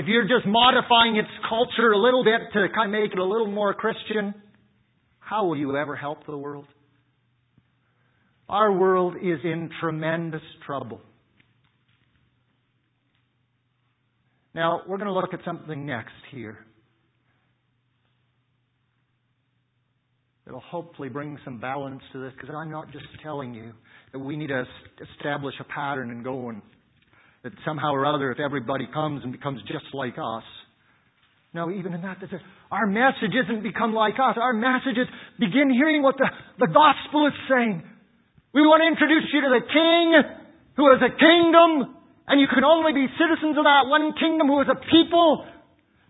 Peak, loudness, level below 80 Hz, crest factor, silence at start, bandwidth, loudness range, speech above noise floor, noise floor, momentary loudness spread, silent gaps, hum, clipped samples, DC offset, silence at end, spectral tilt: 0 dBFS; -21 LUFS; -64 dBFS; 22 dB; 0 s; 4 kHz; 18 LU; 49 dB; -71 dBFS; 20 LU; none; none; under 0.1%; under 0.1%; 0.55 s; -9.5 dB/octave